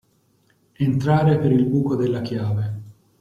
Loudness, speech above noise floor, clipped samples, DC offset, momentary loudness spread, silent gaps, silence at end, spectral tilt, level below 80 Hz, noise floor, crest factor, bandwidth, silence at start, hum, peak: -21 LUFS; 43 dB; under 0.1%; under 0.1%; 8 LU; none; 0.3 s; -9 dB/octave; -52 dBFS; -62 dBFS; 16 dB; 7.2 kHz; 0.8 s; none; -6 dBFS